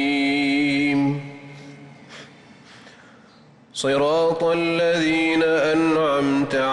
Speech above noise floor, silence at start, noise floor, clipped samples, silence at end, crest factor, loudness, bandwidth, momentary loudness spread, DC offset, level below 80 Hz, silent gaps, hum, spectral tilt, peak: 31 dB; 0 s; -50 dBFS; under 0.1%; 0 s; 10 dB; -20 LUFS; 11.5 kHz; 22 LU; under 0.1%; -58 dBFS; none; none; -5 dB/octave; -12 dBFS